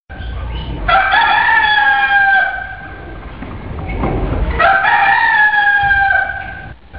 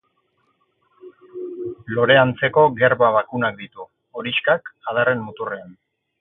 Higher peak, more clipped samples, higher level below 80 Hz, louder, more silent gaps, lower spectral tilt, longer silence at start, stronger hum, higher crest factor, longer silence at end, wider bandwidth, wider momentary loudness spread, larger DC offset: about the same, -2 dBFS vs -2 dBFS; neither; first, -28 dBFS vs -60 dBFS; first, -11 LUFS vs -19 LUFS; neither; second, -1.5 dB/octave vs -10 dB/octave; second, 0.1 s vs 1.05 s; neither; second, 12 dB vs 20 dB; second, 0 s vs 0.5 s; first, 5.2 kHz vs 4 kHz; about the same, 19 LU vs 20 LU; first, 0.8% vs under 0.1%